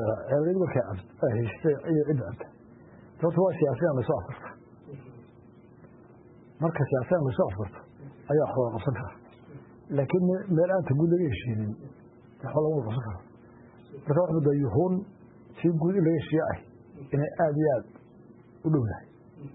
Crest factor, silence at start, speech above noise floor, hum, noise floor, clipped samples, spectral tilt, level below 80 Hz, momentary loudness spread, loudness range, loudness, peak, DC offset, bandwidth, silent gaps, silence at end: 16 dB; 0 s; 26 dB; none; -53 dBFS; under 0.1%; -12.5 dB/octave; -58 dBFS; 21 LU; 4 LU; -28 LUFS; -12 dBFS; under 0.1%; 4 kHz; none; 0.05 s